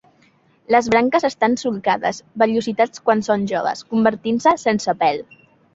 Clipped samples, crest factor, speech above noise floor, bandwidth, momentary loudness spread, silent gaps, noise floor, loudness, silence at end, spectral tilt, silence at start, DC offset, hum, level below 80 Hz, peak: under 0.1%; 18 dB; 38 dB; 8 kHz; 6 LU; none; -57 dBFS; -19 LUFS; 0.5 s; -5 dB/octave; 0.7 s; under 0.1%; none; -58 dBFS; -2 dBFS